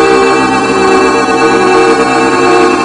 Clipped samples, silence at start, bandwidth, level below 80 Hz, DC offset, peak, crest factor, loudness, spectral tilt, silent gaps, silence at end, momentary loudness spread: 0.4%; 0 s; 11.5 kHz; -38 dBFS; under 0.1%; 0 dBFS; 8 dB; -7 LUFS; -4 dB/octave; none; 0 s; 2 LU